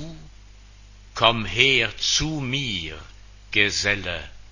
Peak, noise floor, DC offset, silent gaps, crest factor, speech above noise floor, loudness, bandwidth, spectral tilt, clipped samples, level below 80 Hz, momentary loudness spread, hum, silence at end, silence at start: 0 dBFS; -46 dBFS; under 0.1%; none; 24 dB; 24 dB; -21 LUFS; 7.4 kHz; -2.5 dB/octave; under 0.1%; -44 dBFS; 18 LU; none; 0 s; 0 s